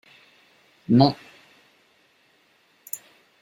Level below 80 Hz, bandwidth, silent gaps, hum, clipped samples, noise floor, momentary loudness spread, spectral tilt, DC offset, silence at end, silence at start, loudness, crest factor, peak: -64 dBFS; 16 kHz; none; none; under 0.1%; -62 dBFS; 20 LU; -6.5 dB/octave; under 0.1%; 0.45 s; 0.9 s; -22 LUFS; 24 dB; -2 dBFS